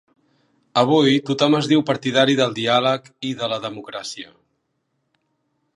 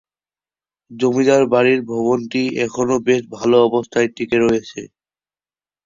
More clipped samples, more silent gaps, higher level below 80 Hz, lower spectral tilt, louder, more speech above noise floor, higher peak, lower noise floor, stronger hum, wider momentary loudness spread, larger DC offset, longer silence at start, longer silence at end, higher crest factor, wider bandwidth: neither; neither; second, -68 dBFS vs -56 dBFS; about the same, -5 dB/octave vs -5.5 dB/octave; about the same, -19 LUFS vs -17 LUFS; second, 53 dB vs over 74 dB; about the same, -2 dBFS vs -2 dBFS; second, -72 dBFS vs under -90 dBFS; neither; first, 14 LU vs 7 LU; neither; second, 0.75 s vs 0.9 s; first, 1.5 s vs 1 s; about the same, 20 dB vs 16 dB; first, 11.5 kHz vs 7.6 kHz